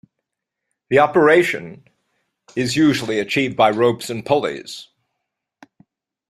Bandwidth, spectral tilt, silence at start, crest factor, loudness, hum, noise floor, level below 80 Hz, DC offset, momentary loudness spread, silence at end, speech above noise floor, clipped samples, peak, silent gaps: 15 kHz; -5 dB/octave; 0.9 s; 18 dB; -17 LUFS; none; -81 dBFS; -60 dBFS; under 0.1%; 17 LU; 1.45 s; 64 dB; under 0.1%; -2 dBFS; none